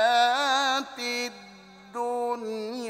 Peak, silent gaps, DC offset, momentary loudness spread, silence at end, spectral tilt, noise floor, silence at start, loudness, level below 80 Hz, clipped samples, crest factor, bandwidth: -10 dBFS; none; under 0.1%; 13 LU; 0 s; -1 dB/octave; -49 dBFS; 0 s; -26 LUFS; -74 dBFS; under 0.1%; 16 dB; 16 kHz